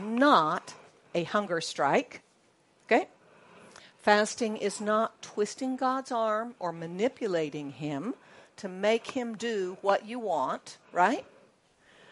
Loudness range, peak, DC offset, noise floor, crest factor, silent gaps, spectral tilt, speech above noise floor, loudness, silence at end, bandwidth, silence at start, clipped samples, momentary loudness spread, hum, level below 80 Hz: 3 LU; -6 dBFS; under 0.1%; -66 dBFS; 24 dB; none; -4 dB/octave; 37 dB; -29 LUFS; 0.9 s; 11.5 kHz; 0 s; under 0.1%; 12 LU; none; -80 dBFS